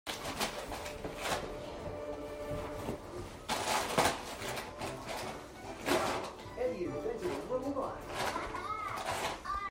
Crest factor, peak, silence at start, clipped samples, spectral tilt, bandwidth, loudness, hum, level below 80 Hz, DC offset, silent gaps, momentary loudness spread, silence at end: 22 dB; -14 dBFS; 0.05 s; under 0.1%; -3.5 dB/octave; 16 kHz; -37 LUFS; none; -56 dBFS; under 0.1%; none; 10 LU; 0 s